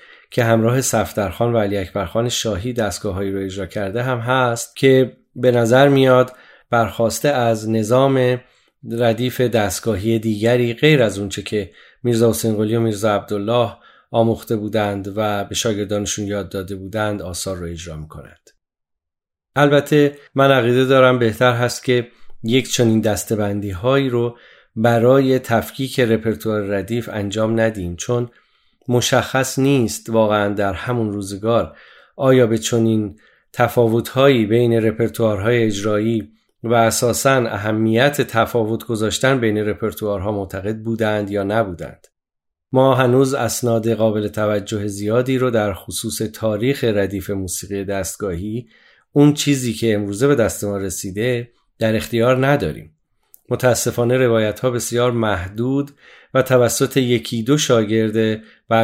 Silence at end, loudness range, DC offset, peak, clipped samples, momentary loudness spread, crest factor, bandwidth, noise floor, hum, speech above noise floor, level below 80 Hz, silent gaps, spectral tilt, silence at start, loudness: 0 s; 5 LU; under 0.1%; -2 dBFS; under 0.1%; 10 LU; 16 dB; 16 kHz; -83 dBFS; none; 66 dB; -52 dBFS; none; -5.5 dB/octave; 0.3 s; -18 LUFS